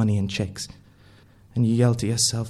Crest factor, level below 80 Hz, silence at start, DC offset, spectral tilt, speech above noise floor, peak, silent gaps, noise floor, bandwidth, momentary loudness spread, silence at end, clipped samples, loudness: 16 dB; -52 dBFS; 0 s; under 0.1%; -5 dB/octave; 30 dB; -8 dBFS; none; -52 dBFS; 13.5 kHz; 14 LU; 0 s; under 0.1%; -23 LUFS